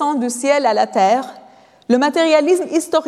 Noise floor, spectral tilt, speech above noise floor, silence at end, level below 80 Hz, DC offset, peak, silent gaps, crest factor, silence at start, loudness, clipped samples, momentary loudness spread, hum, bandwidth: -45 dBFS; -3.5 dB/octave; 30 dB; 0 s; -70 dBFS; under 0.1%; -2 dBFS; none; 14 dB; 0 s; -16 LUFS; under 0.1%; 6 LU; none; 14 kHz